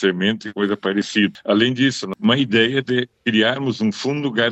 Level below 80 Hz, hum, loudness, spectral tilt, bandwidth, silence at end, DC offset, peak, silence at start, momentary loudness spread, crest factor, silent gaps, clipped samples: -66 dBFS; none; -19 LUFS; -5 dB/octave; 8.4 kHz; 0 s; under 0.1%; 0 dBFS; 0 s; 5 LU; 18 dB; none; under 0.1%